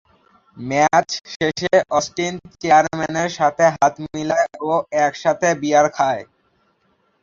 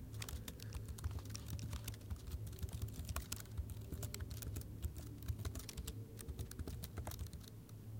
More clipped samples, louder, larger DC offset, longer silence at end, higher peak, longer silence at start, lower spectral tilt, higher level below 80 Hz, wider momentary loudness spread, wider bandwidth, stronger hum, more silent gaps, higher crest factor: neither; first, -18 LUFS vs -48 LUFS; neither; first, 1 s vs 0 s; first, -2 dBFS vs -24 dBFS; first, 0.55 s vs 0 s; about the same, -4 dB/octave vs -4.5 dB/octave; about the same, -56 dBFS vs -52 dBFS; first, 9 LU vs 4 LU; second, 7.6 kHz vs 17 kHz; neither; first, 1.36-1.40 s vs none; second, 18 dB vs 24 dB